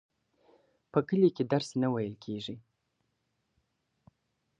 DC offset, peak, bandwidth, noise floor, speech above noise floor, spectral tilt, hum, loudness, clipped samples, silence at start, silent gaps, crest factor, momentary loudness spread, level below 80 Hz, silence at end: under 0.1%; -12 dBFS; 10 kHz; -79 dBFS; 50 dB; -7 dB/octave; none; -31 LUFS; under 0.1%; 0.95 s; none; 22 dB; 13 LU; -72 dBFS; 2 s